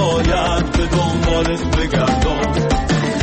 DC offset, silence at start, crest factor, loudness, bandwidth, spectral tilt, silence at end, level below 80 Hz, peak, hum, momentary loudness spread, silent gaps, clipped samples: under 0.1%; 0 s; 10 dB; -17 LUFS; 8.8 kHz; -5.5 dB/octave; 0 s; -22 dBFS; -6 dBFS; none; 2 LU; none; under 0.1%